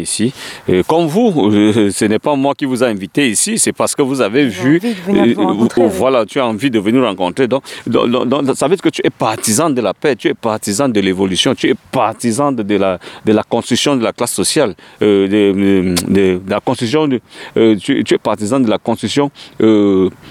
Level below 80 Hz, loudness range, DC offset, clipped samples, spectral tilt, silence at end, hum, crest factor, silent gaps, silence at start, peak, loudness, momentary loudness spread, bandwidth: -52 dBFS; 2 LU; under 0.1%; under 0.1%; -4.5 dB/octave; 0 s; none; 12 dB; none; 0 s; 0 dBFS; -14 LUFS; 5 LU; 16.5 kHz